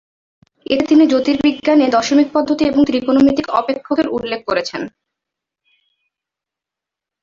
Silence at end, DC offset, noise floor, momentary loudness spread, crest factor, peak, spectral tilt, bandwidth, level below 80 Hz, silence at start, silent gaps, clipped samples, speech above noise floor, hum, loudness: 2.35 s; under 0.1%; -85 dBFS; 8 LU; 14 dB; -2 dBFS; -5 dB/octave; 7.4 kHz; -50 dBFS; 0.7 s; none; under 0.1%; 71 dB; none; -15 LUFS